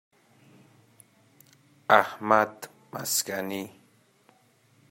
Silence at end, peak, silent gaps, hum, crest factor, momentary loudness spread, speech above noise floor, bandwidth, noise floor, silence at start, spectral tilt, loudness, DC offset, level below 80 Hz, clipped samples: 1.2 s; -2 dBFS; none; none; 28 dB; 20 LU; 37 dB; 16.5 kHz; -63 dBFS; 1.9 s; -2.5 dB/octave; -25 LUFS; under 0.1%; -76 dBFS; under 0.1%